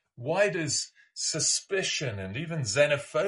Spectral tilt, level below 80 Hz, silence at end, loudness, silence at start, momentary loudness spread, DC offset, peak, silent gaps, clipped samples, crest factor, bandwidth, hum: -2.5 dB/octave; -68 dBFS; 0 s; -28 LUFS; 0.2 s; 9 LU; under 0.1%; -10 dBFS; none; under 0.1%; 18 dB; 11.5 kHz; none